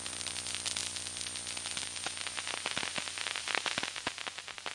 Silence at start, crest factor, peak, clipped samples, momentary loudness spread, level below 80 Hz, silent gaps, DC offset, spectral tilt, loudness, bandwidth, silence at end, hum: 0 s; 28 dB; -10 dBFS; under 0.1%; 4 LU; -72 dBFS; none; under 0.1%; 0 dB/octave; -35 LUFS; 11.5 kHz; 0 s; none